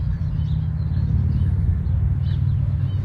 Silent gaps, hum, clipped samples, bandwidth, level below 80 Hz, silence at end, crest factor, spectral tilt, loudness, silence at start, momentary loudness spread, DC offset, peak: none; none; under 0.1%; 4.7 kHz; -26 dBFS; 0 s; 10 dB; -10.5 dB/octave; -22 LUFS; 0 s; 3 LU; under 0.1%; -10 dBFS